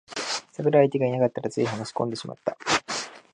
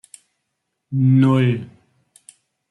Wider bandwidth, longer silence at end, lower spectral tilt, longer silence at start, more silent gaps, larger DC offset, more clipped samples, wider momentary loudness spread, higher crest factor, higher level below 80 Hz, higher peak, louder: about the same, 11 kHz vs 11 kHz; second, 0.15 s vs 1.05 s; second, -4.5 dB/octave vs -8.5 dB/octave; second, 0.1 s vs 0.9 s; neither; neither; neither; about the same, 11 LU vs 13 LU; about the same, 20 dB vs 16 dB; about the same, -66 dBFS vs -64 dBFS; about the same, -6 dBFS vs -6 dBFS; second, -26 LUFS vs -17 LUFS